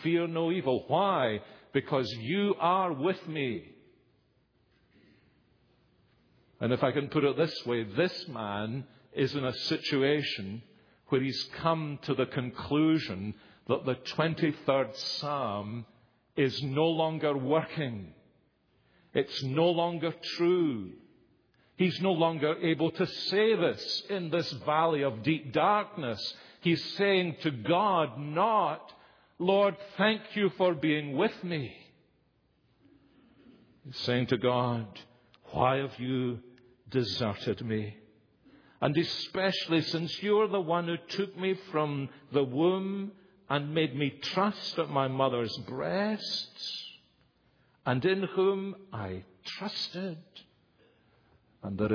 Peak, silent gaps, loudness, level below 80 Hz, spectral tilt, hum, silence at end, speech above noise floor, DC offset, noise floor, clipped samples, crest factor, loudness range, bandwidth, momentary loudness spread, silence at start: -8 dBFS; none; -30 LUFS; -68 dBFS; -6.5 dB/octave; none; 0 s; 40 dB; under 0.1%; -70 dBFS; under 0.1%; 22 dB; 5 LU; 5.4 kHz; 11 LU; 0 s